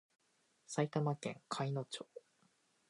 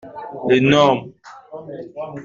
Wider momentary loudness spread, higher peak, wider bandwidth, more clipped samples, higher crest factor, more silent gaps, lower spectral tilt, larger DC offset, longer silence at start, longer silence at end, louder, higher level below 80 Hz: second, 14 LU vs 23 LU; second, -22 dBFS vs -2 dBFS; first, 11.5 kHz vs 7.4 kHz; neither; about the same, 20 dB vs 16 dB; neither; about the same, -5.5 dB/octave vs -6 dB/octave; neither; first, 0.7 s vs 0.05 s; first, 0.7 s vs 0 s; second, -41 LUFS vs -16 LUFS; second, -88 dBFS vs -54 dBFS